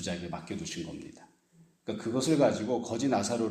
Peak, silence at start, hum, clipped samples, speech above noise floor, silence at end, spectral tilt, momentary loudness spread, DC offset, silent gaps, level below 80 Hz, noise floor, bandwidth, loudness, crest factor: -12 dBFS; 0 s; none; under 0.1%; 32 dB; 0 s; -5 dB/octave; 17 LU; under 0.1%; none; -64 dBFS; -63 dBFS; 15 kHz; -31 LUFS; 18 dB